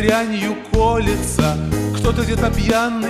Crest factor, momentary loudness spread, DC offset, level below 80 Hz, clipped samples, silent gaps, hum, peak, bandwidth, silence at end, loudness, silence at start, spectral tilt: 18 dB; 4 LU; under 0.1%; -26 dBFS; under 0.1%; none; none; 0 dBFS; 16 kHz; 0 s; -18 LUFS; 0 s; -5.5 dB/octave